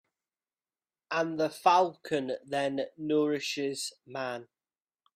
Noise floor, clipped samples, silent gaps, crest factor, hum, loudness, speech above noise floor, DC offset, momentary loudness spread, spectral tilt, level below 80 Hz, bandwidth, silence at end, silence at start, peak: under -90 dBFS; under 0.1%; none; 22 dB; none; -30 LUFS; over 60 dB; under 0.1%; 13 LU; -4 dB/octave; -78 dBFS; 15 kHz; 0.75 s; 1.1 s; -10 dBFS